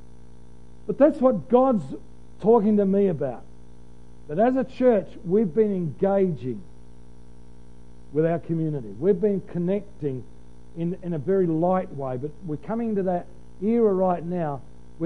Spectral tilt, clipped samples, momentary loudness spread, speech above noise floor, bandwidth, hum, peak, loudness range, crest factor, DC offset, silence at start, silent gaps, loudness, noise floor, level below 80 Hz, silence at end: -10 dB/octave; under 0.1%; 13 LU; 26 dB; 9.8 kHz; 60 Hz at -50 dBFS; -6 dBFS; 5 LU; 18 dB; 1%; 0.85 s; none; -24 LUFS; -49 dBFS; -52 dBFS; 0 s